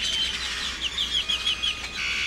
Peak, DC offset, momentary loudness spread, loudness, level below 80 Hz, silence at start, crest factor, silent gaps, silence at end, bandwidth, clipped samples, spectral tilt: -12 dBFS; under 0.1%; 4 LU; -25 LUFS; -44 dBFS; 0 s; 16 dB; none; 0 s; 17.5 kHz; under 0.1%; 0 dB/octave